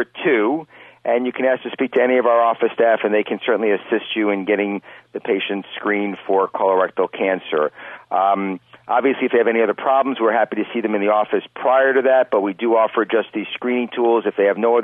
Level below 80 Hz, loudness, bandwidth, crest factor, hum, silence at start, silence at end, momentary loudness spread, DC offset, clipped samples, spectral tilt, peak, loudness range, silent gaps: -72 dBFS; -19 LUFS; 3.8 kHz; 12 dB; none; 0 s; 0 s; 8 LU; under 0.1%; under 0.1%; -8 dB/octave; -6 dBFS; 3 LU; none